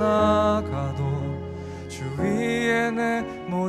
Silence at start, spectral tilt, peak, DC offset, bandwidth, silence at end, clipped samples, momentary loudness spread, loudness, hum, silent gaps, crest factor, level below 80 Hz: 0 s; -6.5 dB/octave; -8 dBFS; under 0.1%; 13 kHz; 0 s; under 0.1%; 14 LU; -24 LUFS; none; none; 16 dB; -50 dBFS